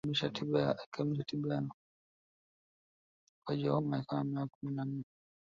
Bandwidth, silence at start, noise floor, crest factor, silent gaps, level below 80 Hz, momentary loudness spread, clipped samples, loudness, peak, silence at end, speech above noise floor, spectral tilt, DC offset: 7.4 kHz; 0.05 s; under -90 dBFS; 20 dB; 0.86-0.92 s, 1.74-3.42 s, 4.55-4.61 s; -72 dBFS; 9 LU; under 0.1%; -36 LUFS; -18 dBFS; 0.4 s; over 55 dB; -5.5 dB/octave; under 0.1%